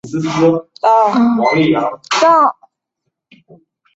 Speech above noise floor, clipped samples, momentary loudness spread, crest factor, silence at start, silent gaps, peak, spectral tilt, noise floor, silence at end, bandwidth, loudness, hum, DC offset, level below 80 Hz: 62 dB; under 0.1%; 6 LU; 14 dB; 0.05 s; none; -2 dBFS; -5.5 dB/octave; -74 dBFS; 1.45 s; 8 kHz; -13 LUFS; none; under 0.1%; -58 dBFS